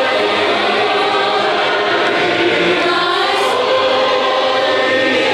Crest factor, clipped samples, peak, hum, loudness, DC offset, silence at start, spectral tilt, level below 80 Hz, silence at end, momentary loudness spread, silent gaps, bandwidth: 10 dB; under 0.1%; -4 dBFS; none; -13 LUFS; under 0.1%; 0 s; -3.5 dB/octave; -58 dBFS; 0 s; 1 LU; none; 13.5 kHz